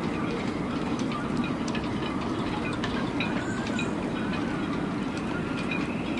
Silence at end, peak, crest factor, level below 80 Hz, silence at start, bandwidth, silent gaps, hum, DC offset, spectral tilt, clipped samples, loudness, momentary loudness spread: 0 s; -16 dBFS; 12 dB; -48 dBFS; 0 s; 11.5 kHz; none; none; under 0.1%; -6 dB/octave; under 0.1%; -30 LUFS; 2 LU